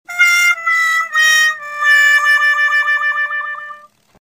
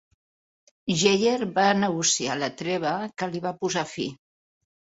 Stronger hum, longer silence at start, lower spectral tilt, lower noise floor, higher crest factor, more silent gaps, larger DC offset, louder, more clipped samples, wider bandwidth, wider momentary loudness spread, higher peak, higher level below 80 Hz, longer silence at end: neither; second, 0.1 s vs 0.85 s; second, 4 dB/octave vs -3.5 dB/octave; second, -38 dBFS vs under -90 dBFS; second, 14 dB vs 20 dB; neither; neither; first, -11 LUFS vs -25 LUFS; neither; first, 16 kHz vs 8 kHz; about the same, 11 LU vs 10 LU; first, 0 dBFS vs -6 dBFS; second, -72 dBFS vs -66 dBFS; second, 0.6 s vs 0.8 s